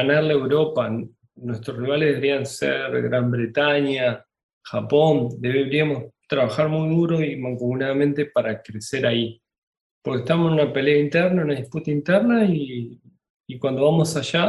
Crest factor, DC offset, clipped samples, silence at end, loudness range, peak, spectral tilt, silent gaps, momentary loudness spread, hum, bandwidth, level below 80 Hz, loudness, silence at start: 16 dB; under 0.1%; under 0.1%; 0 s; 2 LU; -4 dBFS; -6.5 dB/octave; 4.43-4.61 s, 9.58-9.73 s, 9.81-10.01 s, 13.30-13.44 s; 12 LU; none; 12 kHz; -62 dBFS; -21 LUFS; 0 s